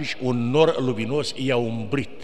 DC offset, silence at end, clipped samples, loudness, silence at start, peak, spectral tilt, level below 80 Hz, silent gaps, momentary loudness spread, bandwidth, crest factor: 2%; 0 s; under 0.1%; -23 LUFS; 0 s; -4 dBFS; -6 dB/octave; -56 dBFS; none; 7 LU; 12 kHz; 20 dB